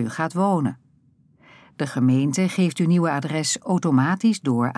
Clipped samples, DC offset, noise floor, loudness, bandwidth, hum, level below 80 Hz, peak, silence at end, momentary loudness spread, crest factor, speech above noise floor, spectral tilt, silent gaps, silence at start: under 0.1%; under 0.1%; -58 dBFS; -21 LUFS; 11 kHz; none; -72 dBFS; -8 dBFS; 0 s; 5 LU; 14 dB; 38 dB; -5.5 dB/octave; none; 0 s